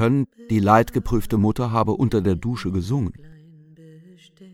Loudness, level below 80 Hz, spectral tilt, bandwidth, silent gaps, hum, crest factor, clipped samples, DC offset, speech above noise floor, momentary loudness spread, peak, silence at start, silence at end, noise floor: -21 LUFS; -40 dBFS; -8 dB/octave; 16.5 kHz; none; none; 20 dB; under 0.1%; under 0.1%; 28 dB; 8 LU; -2 dBFS; 0 s; 0.05 s; -48 dBFS